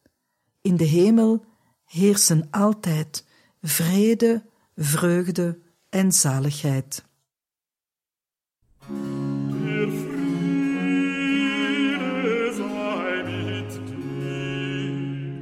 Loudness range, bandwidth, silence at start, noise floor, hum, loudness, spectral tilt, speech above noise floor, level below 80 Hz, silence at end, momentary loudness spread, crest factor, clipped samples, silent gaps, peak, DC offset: 8 LU; 16 kHz; 0.65 s; under -90 dBFS; none; -23 LUFS; -5 dB/octave; over 70 dB; -64 dBFS; 0 s; 13 LU; 18 dB; under 0.1%; none; -6 dBFS; under 0.1%